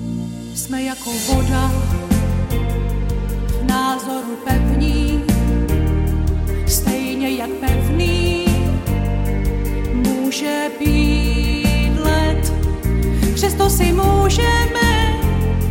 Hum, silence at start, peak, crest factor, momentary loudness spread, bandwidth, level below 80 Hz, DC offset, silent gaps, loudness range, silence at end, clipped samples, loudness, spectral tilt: none; 0 s; -2 dBFS; 14 dB; 7 LU; 17 kHz; -20 dBFS; under 0.1%; none; 3 LU; 0 s; under 0.1%; -18 LUFS; -5.5 dB/octave